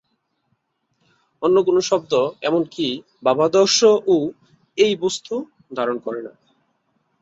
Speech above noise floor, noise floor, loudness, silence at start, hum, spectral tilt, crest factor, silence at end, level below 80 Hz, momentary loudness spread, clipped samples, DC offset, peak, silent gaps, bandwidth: 52 dB; -71 dBFS; -19 LUFS; 1.4 s; none; -3.5 dB/octave; 18 dB; 0.95 s; -66 dBFS; 14 LU; under 0.1%; under 0.1%; -2 dBFS; none; 8 kHz